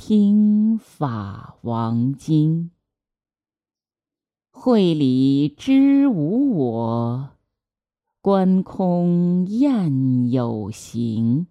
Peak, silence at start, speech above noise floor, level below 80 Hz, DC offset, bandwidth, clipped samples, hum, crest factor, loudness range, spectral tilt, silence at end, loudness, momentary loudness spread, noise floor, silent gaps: -6 dBFS; 0 s; over 72 dB; -62 dBFS; under 0.1%; 10.5 kHz; under 0.1%; none; 14 dB; 6 LU; -8.5 dB/octave; 0.05 s; -19 LUFS; 11 LU; under -90 dBFS; none